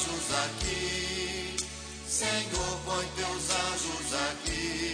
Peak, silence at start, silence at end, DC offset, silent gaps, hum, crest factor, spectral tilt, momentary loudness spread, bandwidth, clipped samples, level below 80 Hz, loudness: -14 dBFS; 0 s; 0 s; under 0.1%; none; none; 18 dB; -2 dB/octave; 4 LU; 10.5 kHz; under 0.1%; -46 dBFS; -31 LUFS